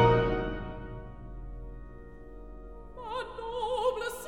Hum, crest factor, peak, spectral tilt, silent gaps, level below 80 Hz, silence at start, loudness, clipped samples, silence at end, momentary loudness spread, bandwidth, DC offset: none; 22 dB; -10 dBFS; -6.5 dB/octave; none; -44 dBFS; 0 s; -32 LUFS; under 0.1%; 0 s; 19 LU; 16 kHz; 0.2%